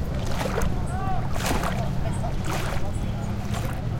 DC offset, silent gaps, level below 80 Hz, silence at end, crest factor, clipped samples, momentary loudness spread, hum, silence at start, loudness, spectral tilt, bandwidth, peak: under 0.1%; none; -32 dBFS; 0 s; 16 dB; under 0.1%; 3 LU; none; 0 s; -28 LUFS; -5.5 dB/octave; 17 kHz; -8 dBFS